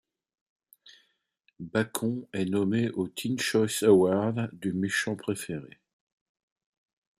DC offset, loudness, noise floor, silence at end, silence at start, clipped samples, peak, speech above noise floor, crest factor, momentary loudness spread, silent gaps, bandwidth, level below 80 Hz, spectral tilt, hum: under 0.1%; -28 LUFS; -72 dBFS; 1.55 s; 1.6 s; under 0.1%; -8 dBFS; 45 dB; 22 dB; 11 LU; none; 15 kHz; -70 dBFS; -5 dB/octave; none